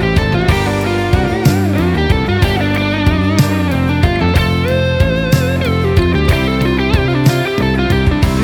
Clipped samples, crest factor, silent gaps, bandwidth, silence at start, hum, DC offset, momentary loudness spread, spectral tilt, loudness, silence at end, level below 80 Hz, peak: under 0.1%; 12 dB; none; 18.5 kHz; 0 s; none; under 0.1%; 2 LU; -6.5 dB/octave; -13 LUFS; 0 s; -22 dBFS; 0 dBFS